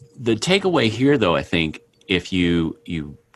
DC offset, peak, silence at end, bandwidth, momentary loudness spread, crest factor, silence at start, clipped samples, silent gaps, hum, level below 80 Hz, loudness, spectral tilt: under 0.1%; -2 dBFS; 0.2 s; 12 kHz; 12 LU; 18 dB; 0.2 s; under 0.1%; none; none; -46 dBFS; -20 LUFS; -5.5 dB/octave